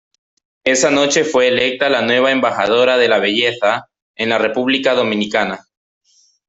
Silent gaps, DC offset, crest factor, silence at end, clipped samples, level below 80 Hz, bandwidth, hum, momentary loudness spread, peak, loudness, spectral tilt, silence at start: 4.02-4.14 s; under 0.1%; 14 dB; 0.9 s; under 0.1%; -58 dBFS; 8.2 kHz; none; 6 LU; -2 dBFS; -15 LUFS; -2.5 dB/octave; 0.65 s